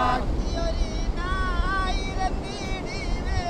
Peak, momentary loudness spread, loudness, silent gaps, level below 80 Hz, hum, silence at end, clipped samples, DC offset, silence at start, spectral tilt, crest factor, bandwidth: -10 dBFS; 5 LU; -28 LUFS; none; -28 dBFS; none; 0 s; under 0.1%; under 0.1%; 0 s; -5.5 dB/octave; 14 dB; 9.4 kHz